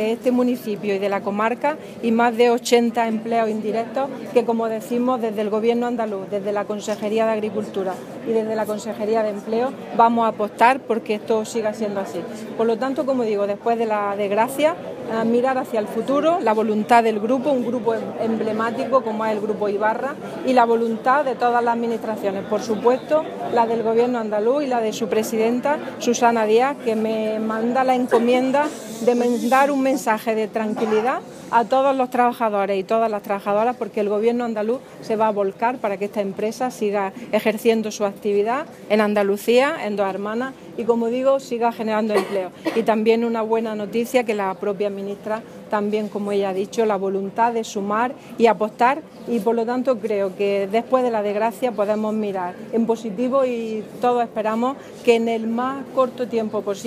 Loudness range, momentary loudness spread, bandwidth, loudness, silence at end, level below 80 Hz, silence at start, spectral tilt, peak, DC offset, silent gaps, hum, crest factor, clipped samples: 3 LU; 7 LU; 15.5 kHz; -21 LUFS; 0 s; -68 dBFS; 0 s; -5 dB/octave; 0 dBFS; under 0.1%; none; none; 20 dB; under 0.1%